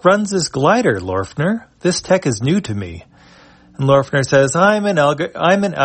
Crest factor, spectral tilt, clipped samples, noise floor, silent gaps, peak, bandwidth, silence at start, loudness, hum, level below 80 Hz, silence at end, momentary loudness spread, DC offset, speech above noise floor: 16 dB; -5 dB/octave; under 0.1%; -45 dBFS; none; 0 dBFS; 8.8 kHz; 0.05 s; -16 LUFS; none; -50 dBFS; 0 s; 7 LU; under 0.1%; 30 dB